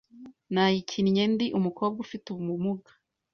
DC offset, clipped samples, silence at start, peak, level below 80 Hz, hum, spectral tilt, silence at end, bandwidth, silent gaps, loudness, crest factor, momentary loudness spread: under 0.1%; under 0.1%; 0.15 s; -12 dBFS; -66 dBFS; none; -6.5 dB/octave; 0.55 s; 6.8 kHz; none; -28 LUFS; 16 dB; 11 LU